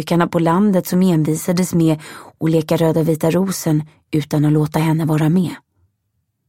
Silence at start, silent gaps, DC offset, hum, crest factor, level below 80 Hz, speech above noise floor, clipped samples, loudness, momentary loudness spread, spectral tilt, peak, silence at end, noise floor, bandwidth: 0 s; none; 0.1%; none; 16 dB; -54 dBFS; 54 dB; under 0.1%; -17 LUFS; 8 LU; -7 dB/octave; 0 dBFS; 0.9 s; -70 dBFS; 16.5 kHz